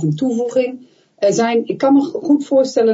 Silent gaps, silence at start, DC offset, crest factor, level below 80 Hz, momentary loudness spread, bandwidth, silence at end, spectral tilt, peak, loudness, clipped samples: none; 0 s; under 0.1%; 12 dB; -68 dBFS; 5 LU; 8 kHz; 0 s; -6 dB/octave; -4 dBFS; -16 LUFS; under 0.1%